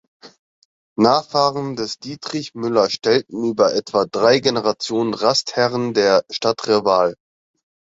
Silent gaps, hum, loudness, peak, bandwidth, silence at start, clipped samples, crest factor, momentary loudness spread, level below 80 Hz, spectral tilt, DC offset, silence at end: 0.39-0.96 s; none; -18 LUFS; 0 dBFS; 7.8 kHz; 0.25 s; under 0.1%; 18 dB; 10 LU; -60 dBFS; -4.5 dB/octave; under 0.1%; 0.8 s